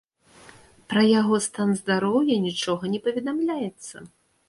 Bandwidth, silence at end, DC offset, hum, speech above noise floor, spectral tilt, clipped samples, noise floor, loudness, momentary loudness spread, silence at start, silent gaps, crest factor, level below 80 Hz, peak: 11.5 kHz; 0.4 s; under 0.1%; none; 29 dB; -5 dB/octave; under 0.1%; -52 dBFS; -23 LUFS; 13 LU; 0.9 s; none; 16 dB; -66 dBFS; -8 dBFS